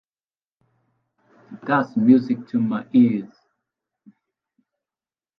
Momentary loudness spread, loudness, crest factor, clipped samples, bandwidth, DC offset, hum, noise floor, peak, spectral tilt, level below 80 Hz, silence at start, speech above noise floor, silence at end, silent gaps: 13 LU; -20 LUFS; 20 dB; under 0.1%; 5.2 kHz; under 0.1%; none; under -90 dBFS; -4 dBFS; -9.5 dB/octave; -72 dBFS; 1.5 s; over 71 dB; 2.15 s; none